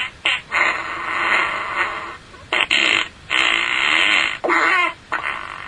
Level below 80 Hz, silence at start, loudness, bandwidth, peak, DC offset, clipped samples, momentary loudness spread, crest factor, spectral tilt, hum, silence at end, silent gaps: -52 dBFS; 0 s; -17 LUFS; 11 kHz; 0 dBFS; under 0.1%; under 0.1%; 9 LU; 20 dB; -1 dB/octave; none; 0 s; none